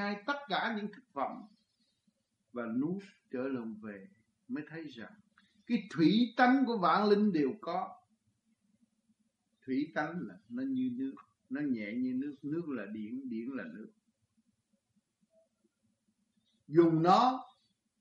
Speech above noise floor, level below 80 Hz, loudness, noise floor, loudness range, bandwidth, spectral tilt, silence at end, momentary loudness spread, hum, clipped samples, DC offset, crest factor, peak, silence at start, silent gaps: 46 dB; -84 dBFS; -33 LUFS; -79 dBFS; 11 LU; 7.4 kHz; -7 dB/octave; 0.55 s; 18 LU; none; under 0.1%; under 0.1%; 22 dB; -12 dBFS; 0 s; none